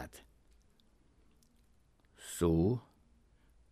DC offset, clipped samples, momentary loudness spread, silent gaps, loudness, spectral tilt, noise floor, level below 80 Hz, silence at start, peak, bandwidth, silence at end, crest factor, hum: under 0.1%; under 0.1%; 21 LU; none; -34 LUFS; -7 dB/octave; -69 dBFS; -56 dBFS; 0 s; -18 dBFS; 15.5 kHz; 0.9 s; 20 dB; none